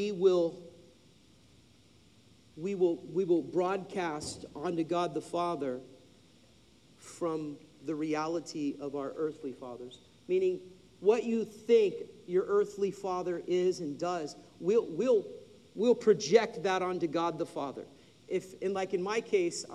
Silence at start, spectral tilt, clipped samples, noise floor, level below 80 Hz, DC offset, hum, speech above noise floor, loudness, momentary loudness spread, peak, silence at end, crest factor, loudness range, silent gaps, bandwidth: 0 s; -5.5 dB/octave; under 0.1%; -62 dBFS; -74 dBFS; under 0.1%; none; 31 dB; -32 LUFS; 16 LU; -10 dBFS; 0 s; 22 dB; 7 LU; none; 11.5 kHz